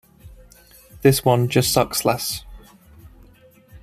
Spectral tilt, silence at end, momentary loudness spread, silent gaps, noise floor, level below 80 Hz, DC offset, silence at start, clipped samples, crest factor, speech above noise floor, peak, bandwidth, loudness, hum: -4.5 dB/octave; 0.05 s; 8 LU; none; -51 dBFS; -46 dBFS; under 0.1%; 0.25 s; under 0.1%; 20 dB; 32 dB; -2 dBFS; 15.5 kHz; -19 LUFS; none